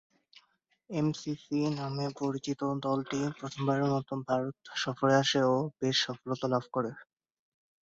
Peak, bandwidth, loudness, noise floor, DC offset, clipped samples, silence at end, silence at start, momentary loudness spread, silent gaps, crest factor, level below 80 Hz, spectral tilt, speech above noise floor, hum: -14 dBFS; 7.8 kHz; -31 LUFS; -72 dBFS; under 0.1%; under 0.1%; 0.9 s; 0.9 s; 8 LU; none; 18 dB; -72 dBFS; -5.5 dB/octave; 41 dB; none